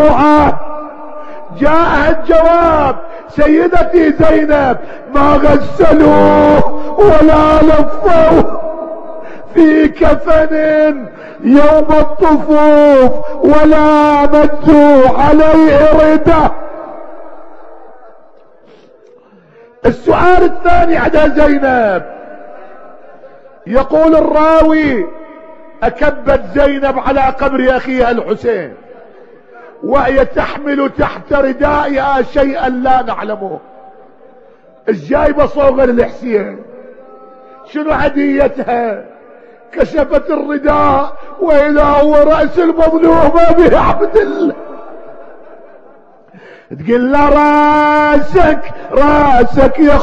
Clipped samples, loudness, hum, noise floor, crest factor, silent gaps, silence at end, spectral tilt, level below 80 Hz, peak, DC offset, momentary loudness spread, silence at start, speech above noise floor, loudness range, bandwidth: 2%; -10 LUFS; none; -43 dBFS; 10 dB; none; 0 s; -7.5 dB/octave; -24 dBFS; 0 dBFS; under 0.1%; 15 LU; 0 s; 35 dB; 8 LU; 7.8 kHz